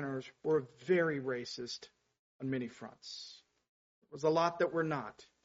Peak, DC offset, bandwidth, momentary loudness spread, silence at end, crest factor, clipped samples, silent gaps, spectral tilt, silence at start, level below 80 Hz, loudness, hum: -18 dBFS; under 0.1%; 7.6 kHz; 16 LU; 0.2 s; 20 dB; under 0.1%; 2.19-2.39 s, 3.69-4.02 s; -4.5 dB/octave; 0 s; -78 dBFS; -36 LUFS; none